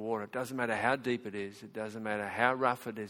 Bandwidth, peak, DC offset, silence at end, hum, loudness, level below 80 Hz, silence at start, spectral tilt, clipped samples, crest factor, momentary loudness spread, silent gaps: 17 kHz; -10 dBFS; under 0.1%; 0 s; none; -33 LUFS; -72 dBFS; 0 s; -5 dB/octave; under 0.1%; 24 dB; 12 LU; none